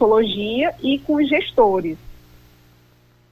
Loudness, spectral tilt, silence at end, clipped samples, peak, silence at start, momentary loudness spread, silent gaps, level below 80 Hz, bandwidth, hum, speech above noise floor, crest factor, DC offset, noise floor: -19 LUFS; -6.5 dB/octave; 1.2 s; under 0.1%; -4 dBFS; 0 s; 8 LU; none; -50 dBFS; 14.5 kHz; 60 Hz at -45 dBFS; 36 dB; 16 dB; under 0.1%; -54 dBFS